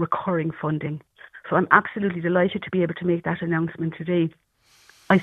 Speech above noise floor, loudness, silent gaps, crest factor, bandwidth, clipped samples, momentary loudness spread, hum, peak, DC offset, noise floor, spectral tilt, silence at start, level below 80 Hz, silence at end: 33 dB; -23 LUFS; none; 24 dB; 6.6 kHz; under 0.1%; 10 LU; none; 0 dBFS; under 0.1%; -57 dBFS; -8.5 dB/octave; 0 s; -60 dBFS; 0 s